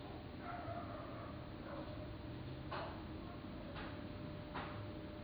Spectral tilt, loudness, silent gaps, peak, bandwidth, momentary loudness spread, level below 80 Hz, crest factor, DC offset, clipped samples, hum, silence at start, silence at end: -9 dB/octave; -49 LUFS; none; -32 dBFS; over 20 kHz; 3 LU; -58 dBFS; 16 dB; under 0.1%; under 0.1%; none; 0 s; 0 s